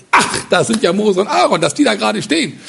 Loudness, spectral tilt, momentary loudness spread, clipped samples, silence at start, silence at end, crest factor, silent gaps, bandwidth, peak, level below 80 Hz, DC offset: -14 LUFS; -3.5 dB/octave; 3 LU; under 0.1%; 0.15 s; 0 s; 14 dB; none; 11.5 kHz; 0 dBFS; -52 dBFS; under 0.1%